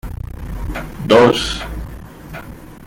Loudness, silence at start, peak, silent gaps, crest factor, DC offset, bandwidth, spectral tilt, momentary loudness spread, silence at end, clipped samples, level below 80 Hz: -15 LUFS; 0.05 s; -2 dBFS; none; 18 dB; under 0.1%; 17 kHz; -5 dB/octave; 23 LU; 0 s; under 0.1%; -30 dBFS